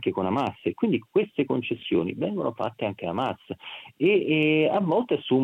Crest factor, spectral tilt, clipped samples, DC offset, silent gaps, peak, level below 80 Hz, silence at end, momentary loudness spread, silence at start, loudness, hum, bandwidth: 16 dB; -8 dB/octave; under 0.1%; under 0.1%; none; -10 dBFS; -70 dBFS; 0 s; 9 LU; 0 s; -25 LUFS; none; 6.6 kHz